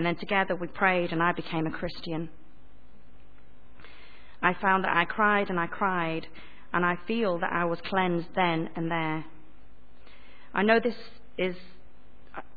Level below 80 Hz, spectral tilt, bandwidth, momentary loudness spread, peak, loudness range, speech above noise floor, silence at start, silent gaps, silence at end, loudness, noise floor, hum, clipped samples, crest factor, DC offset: -58 dBFS; -8.5 dB/octave; 4.9 kHz; 12 LU; -8 dBFS; 5 LU; 29 dB; 0 s; none; 0.15 s; -28 LUFS; -57 dBFS; none; under 0.1%; 22 dB; 1%